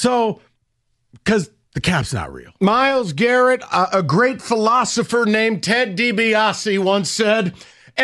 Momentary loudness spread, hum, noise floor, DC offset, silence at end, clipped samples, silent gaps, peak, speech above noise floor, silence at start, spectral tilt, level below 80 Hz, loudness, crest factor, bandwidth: 10 LU; none; -67 dBFS; under 0.1%; 0 s; under 0.1%; none; -4 dBFS; 50 dB; 0 s; -4.5 dB/octave; -50 dBFS; -17 LUFS; 14 dB; 12.5 kHz